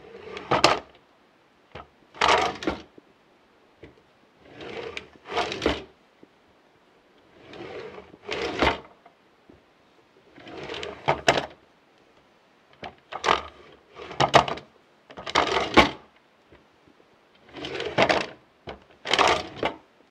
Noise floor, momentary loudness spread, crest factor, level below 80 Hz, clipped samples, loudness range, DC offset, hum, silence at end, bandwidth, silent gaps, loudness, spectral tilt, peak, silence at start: -60 dBFS; 23 LU; 28 dB; -50 dBFS; under 0.1%; 9 LU; under 0.1%; none; 0.35 s; 15.5 kHz; none; -24 LUFS; -3.5 dB/octave; 0 dBFS; 0.05 s